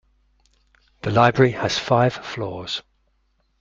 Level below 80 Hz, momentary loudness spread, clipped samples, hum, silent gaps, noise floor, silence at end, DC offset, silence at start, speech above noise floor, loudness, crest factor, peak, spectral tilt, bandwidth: -54 dBFS; 13 LU; under 0.1%; none; none; -66 dBFS; 0.8 s; under 0.1%; 1.05 s; 47 dB; -21 LUFS; 20 dB; -2 dBFS; -5.5 dB/octave; 7.6 kHz